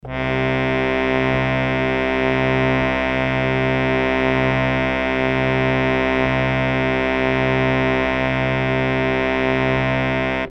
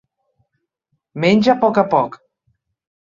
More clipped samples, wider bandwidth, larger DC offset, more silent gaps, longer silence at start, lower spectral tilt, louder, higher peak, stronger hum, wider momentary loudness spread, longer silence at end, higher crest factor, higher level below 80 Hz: neither; about the same, 8 kHz vs 7.4 kHz; neither; neither; second, 0.05 s vs 1.15 s; about the same, -7.5 dB/octave vs -7 dB/octave; second, -19 LUFS vs -16 LUFS; about the same, -4 dBFS vs -2 dBFS; neither; second, 2 LU vs 11 LU; second, 0 s vs 0.95 s; about the same, 16 dB vs 18 dB; first, -36 dBFS vs -60 dBFS